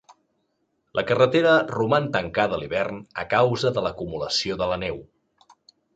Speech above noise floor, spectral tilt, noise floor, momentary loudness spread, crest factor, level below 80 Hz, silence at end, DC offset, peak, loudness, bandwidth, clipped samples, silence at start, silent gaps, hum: 50 dB; -5 dB/octave; -72 dBFS; 11 LU; 20 dB; -52 dBFS; 0.9 s; under 0.1%; -4 dBFS; -23 LUFS; 8.8 kHz; under 0.1%; 0.95 s; none; none